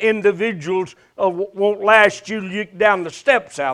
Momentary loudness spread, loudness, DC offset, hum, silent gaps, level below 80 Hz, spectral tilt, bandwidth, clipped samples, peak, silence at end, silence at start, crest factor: 12 LU; -18 LUFS; under 0.1%; none; none; -60 dBFS; -4.5 dB/octave; 11 kHz; under 0.1%; 0 dBFS; 0 s; 0 s; 18 dB